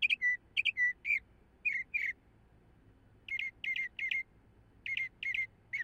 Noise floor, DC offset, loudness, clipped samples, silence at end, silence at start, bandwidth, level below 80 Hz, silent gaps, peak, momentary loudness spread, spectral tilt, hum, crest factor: -64 dBFS; under 0.1%; -34 LUFS; under 0.1%; 0 s; 0 s; 15.5 kHz; -68 dBFS; none; -18 dBFS; 9 LU; -0.5 dB/octave; none; 18 dB